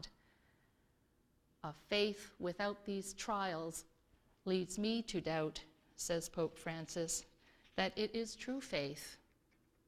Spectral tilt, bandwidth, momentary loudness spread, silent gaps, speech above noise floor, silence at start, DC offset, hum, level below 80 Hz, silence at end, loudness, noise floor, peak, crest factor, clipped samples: -3.5 dB/octave; 16 kHz; 13 LU; none; 34 dB; 0 s; under 0.1%; none; -70 dBFS; 0.7 s; -41 LUFS; -75 dBFS; -22 dBFS; 22 dB; under 0.1%